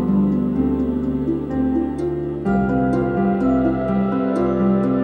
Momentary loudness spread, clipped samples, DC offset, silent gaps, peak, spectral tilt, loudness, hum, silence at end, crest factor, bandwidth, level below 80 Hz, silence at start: 4 LU; under 0.1%; under 0.1%; none; -8 dBFS; -10 dB/octave; -20 LUFS; none; 0 s; 12 dB; 8.6 kHz; -36 dBFS; 0 s